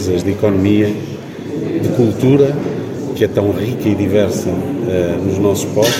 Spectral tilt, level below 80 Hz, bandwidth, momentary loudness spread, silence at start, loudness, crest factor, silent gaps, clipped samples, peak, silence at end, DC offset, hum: -6 dB/octave; -46 dBFS; 16.5 kHz; 10 LU; 0 s; -15 LUFS; 14 dB; none; under 0.1%; 0 dBFS; 0 s; under 0.1%; none